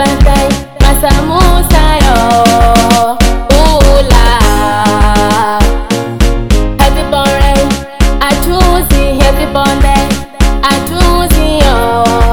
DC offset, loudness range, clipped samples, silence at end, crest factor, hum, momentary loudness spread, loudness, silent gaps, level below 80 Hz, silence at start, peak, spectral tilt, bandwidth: 4%; 3 LU; 6%; 0 s; 8 dB; none; 5 LU; -9 LUFS; none; -10 dBFS; 0 s; 0 dBFS; -5 dB/octave; 19 kHz